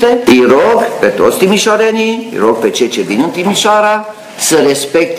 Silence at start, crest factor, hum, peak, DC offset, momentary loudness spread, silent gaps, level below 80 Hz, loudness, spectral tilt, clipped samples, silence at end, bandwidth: 0 s; 10 dB; none; 0 dBFS; under 0.1%; 6 LU; none; -50 dBFS; -10 LUFS; -3.5 dB/octave; 0.3%; 0 s; 16 kHz